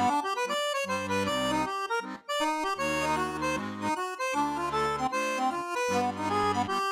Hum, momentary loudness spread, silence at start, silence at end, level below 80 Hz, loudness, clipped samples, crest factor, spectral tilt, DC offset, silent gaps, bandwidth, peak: none; 4 LU; 0 s; 0 s; -60 dBFS; -29 LUFS; under 0.1%; 14 dB; -3.5 dB/octave; under 0.1%; none; 16.5 kHz; -14 dBFS